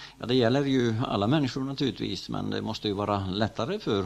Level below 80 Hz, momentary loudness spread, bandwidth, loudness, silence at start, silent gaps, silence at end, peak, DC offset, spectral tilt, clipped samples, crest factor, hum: -56 dBFS; 8 LU; 12.5 kHz; -28 LUFS; 0 s; none; 0 s; -10 dBFS; under 0.1%; -6.5 dB/octave; under 0.1%; 18 dB; none